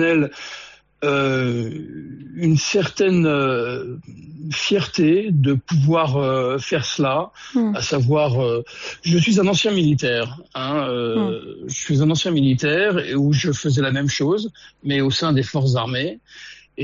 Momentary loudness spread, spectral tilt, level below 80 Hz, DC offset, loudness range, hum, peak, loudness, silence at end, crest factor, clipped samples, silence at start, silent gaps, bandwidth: 14 LU; -5 dB/octave; -54 dBFS; under 0.1%; 2 LU; none; -6 dBFS; -19 LUFS; 0 s; 12 dB; under 0.1%; 0 s; none; 7.6 kHz